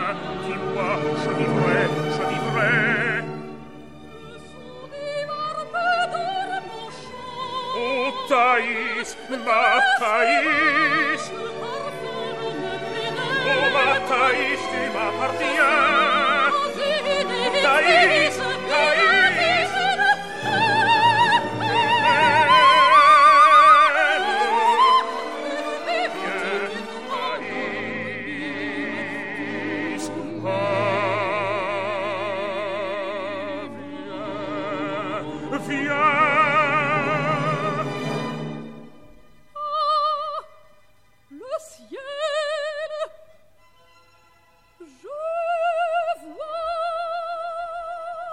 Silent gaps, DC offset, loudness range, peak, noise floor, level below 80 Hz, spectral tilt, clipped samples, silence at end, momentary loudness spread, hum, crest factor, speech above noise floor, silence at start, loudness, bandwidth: none; 0.5%; 13 LU; -4 dBFS; -60 dBFS; -60 dBFS; -4 dB/octave; under 0.1%; 0 s; 16 LU; none; 18 dB; 39 dB; 0 s; -20 LUFS; 13.5 kHz